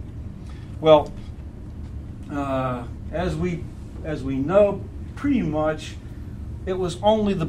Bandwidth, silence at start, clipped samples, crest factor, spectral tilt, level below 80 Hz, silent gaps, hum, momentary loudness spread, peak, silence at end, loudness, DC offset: 11 kHz; 0 s; under 0.1%; 22 dB; -7 dB/octave; -38 dBFS; none; none; 19 LU; -2 dBFS; 0 s; -23 LUFS; under 0.1%